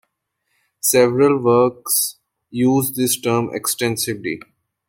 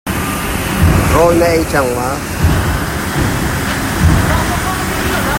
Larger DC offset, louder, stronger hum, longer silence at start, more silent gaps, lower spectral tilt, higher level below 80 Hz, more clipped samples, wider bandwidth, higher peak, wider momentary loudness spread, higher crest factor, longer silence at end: neither; second, -18 LUFS vs -14 LUFS; neither; first, 0.85 s vs 0.05 s; neither; about the same, -4 dB/octave vs -5 dB/octave; second, -62 dBFS vs -22 dBFS; neither; about the same, 16.5 kHz vs 16.5 kHz; about the same, -2 dBFS vs 0 dBFS; first, 10 LU vs 7 LU; about the same, 18 dB vs 14 dB; first, 0.5 s vs 0 s